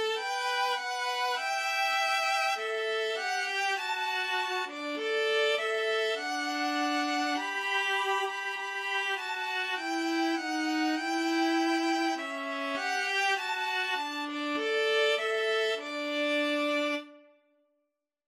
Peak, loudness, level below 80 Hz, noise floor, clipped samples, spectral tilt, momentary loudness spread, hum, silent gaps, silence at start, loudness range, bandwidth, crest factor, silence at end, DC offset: -16 dBFS; -29 LUFS; under -90 dBFS; -82 dBFS; under 0.1%; 0 dB/octave; 5 LU; none; none; 0 s; 1 LU; 16 kHz; 14 dB; 1.1 s; under 0.1%